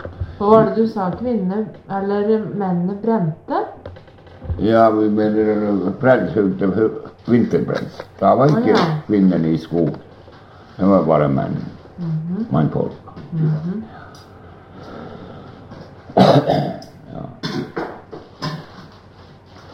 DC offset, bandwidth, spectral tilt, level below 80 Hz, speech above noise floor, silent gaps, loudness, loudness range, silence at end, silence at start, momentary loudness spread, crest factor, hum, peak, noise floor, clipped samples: under 0.1%; 7.6 kHz; -8.5 dB/octave; -46 dBFS; 26 dB; none; -18 LUFS; 7 LU; 0 s; 0 s; 22 LU; 18 dB; none; 0 dBFS; -43 dBFS; under 0.1%